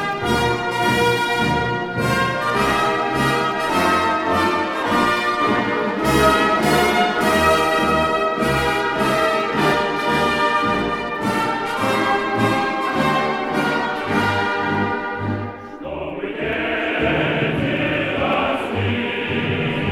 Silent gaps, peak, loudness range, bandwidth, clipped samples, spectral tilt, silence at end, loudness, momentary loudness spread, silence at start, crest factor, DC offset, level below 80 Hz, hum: none; -2 dBFS; 5 LU; 19.5 kHz; under 0.1%; -5 dB/octave; 0 s; -19 LUFS; 6 LU; 0 s; 16 dB; under 0.1%; -42 dBFS; none